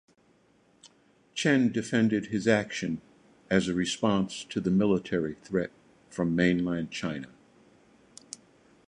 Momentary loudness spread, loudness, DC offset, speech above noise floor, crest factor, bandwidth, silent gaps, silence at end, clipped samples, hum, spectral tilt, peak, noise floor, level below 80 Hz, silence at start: 15 LU; -28 LUFS; under 0.1%; 37 dB; 20 dB; 11 kHz; none; 1.65 s; under 0.1%; none; -5.5 dB/octave; -8 dBFS; -64 dBFS; -58 dBFS; 0.85 s